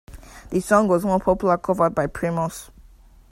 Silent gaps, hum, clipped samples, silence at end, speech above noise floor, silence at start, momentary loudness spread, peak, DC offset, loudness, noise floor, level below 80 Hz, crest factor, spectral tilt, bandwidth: none; none; under 0.1%; 0.5 s; 29 dB; 0.1 s; 9 LU; -2 dBFS; under 0.1%; -21 LUFS; -49 dBFS; -44 dBFS; 20 dB; -6.5 dB/octave; 16 kHz